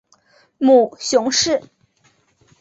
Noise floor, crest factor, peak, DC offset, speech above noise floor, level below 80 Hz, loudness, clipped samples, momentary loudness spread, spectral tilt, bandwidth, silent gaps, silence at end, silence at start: -60 dBFS; 16 dB; -2 dBFS; under 0.1%; 44 dB; -60 dBFS; -16 LUFS; under 0.1%; 6 LU; -2 dB/octave; 8.2 kHz; none; 1 s; 0.6 s